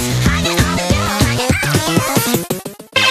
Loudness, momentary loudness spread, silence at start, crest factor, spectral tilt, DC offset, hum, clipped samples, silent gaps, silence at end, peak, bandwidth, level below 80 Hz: -15 LUFS; 4 LU; 0 s; 16 dB; -4 dB/octave; under 0.1%; none; under 0.1%; none; 0 s; 0 dBFS; 14.5 kHz; -28 dBFS